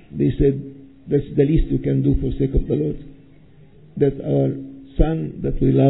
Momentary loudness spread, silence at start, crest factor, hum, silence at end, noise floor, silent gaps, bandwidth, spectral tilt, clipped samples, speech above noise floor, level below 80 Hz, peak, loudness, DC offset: 14 LU; 0.1 s; 18 dB; none; 0 s; -48 dBFS; none; 4 kHz; -13 dB/octave; under 0.1%; 30 dB; -28 dBFS; -2 dBFS; -21 LUFS; 0.3%